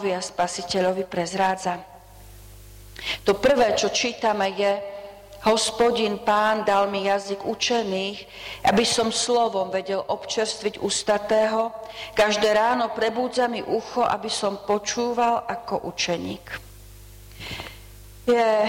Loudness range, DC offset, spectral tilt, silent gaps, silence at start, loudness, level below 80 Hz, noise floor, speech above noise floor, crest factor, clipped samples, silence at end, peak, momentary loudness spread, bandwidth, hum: 4 LU; under 0.1%; -3 dB/octave; none; 0 s; -23 LUFS; -52 dBFS; -45 dBFS; 22 dB; 14 dB; under 0.1%; 0 s; -10 dBFS; 14 LU; 16.5 kHz; 50 Hz at -50 dBFS